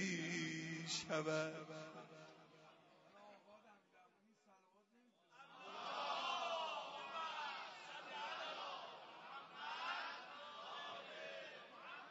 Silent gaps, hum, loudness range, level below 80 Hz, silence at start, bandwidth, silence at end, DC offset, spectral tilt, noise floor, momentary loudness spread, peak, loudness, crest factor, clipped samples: none; none; 16 LU; under -90 dBFS; 0 s; 7.6 kHz; 0 s; under 0.1%; -2 dB/octave; -75 dBFS; 22 LU; -28 dBFS; -47 LUFS; 20 dB; under 0.1%